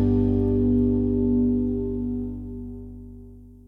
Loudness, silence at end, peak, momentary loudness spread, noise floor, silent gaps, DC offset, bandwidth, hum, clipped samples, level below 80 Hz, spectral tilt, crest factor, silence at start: -23 LUFS; 0.1 s; -10 dBFS; 19 LU; -44 dBFS; none; under 0.1%; 3.2 kHz; 50 Hz at -40 dBFS; under 0.1%; -34 dBFS; -12.5 dB/octave; 12 dB; 0 s